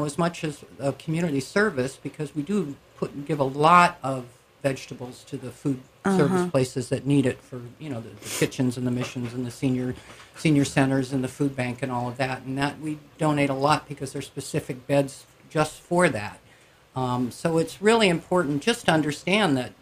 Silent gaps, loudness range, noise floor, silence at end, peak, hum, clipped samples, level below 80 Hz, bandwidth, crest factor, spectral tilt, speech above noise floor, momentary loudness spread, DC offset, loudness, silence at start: none; 4 LU; -55 dBFS; 0.1 s; -2 dBFS; none; under 0.1%; -58 dBFS; 15.5 kHz; 22 dB; -5.5 dB/octave; 30 dB; 13 LU; under 0.1%; -25 LUFS; 0 s